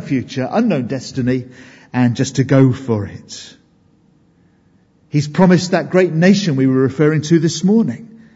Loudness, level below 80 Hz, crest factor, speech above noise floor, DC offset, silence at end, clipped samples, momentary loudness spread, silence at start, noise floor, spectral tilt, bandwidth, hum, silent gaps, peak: -15 LUFS; -54 dBFS; 16 dB; 39 dB; under 0.1%; 0.3 s; under 0.1%; 11 LU; 0 s; -54 dBFS; -6.5 dB/octave; 8 kHz; none; none; 0 dBFS